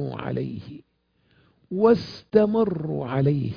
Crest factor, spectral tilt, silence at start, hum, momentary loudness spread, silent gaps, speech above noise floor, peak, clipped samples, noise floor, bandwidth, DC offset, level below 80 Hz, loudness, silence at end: 20 dB; -9.5 dB/octave; 0 s; none; 14 LU; none; 43 dB; -4 dBFS; under 0.1%; -66 dBFS; 5.2 kHz; under 0.1%; -56 dBFS; -23 LUFS; 0 s